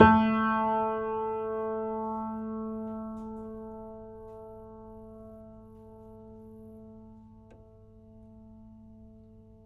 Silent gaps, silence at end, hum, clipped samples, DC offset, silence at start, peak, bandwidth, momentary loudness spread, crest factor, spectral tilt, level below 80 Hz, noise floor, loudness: none; 0.25 s; none; under 0.1%; under 0.1%; 0 s; -4 dBFS; 5 kHz; 25 LU; 28 dB; -9 dB/octave; -54 dBFS; -54 dBFS; -30 LUFS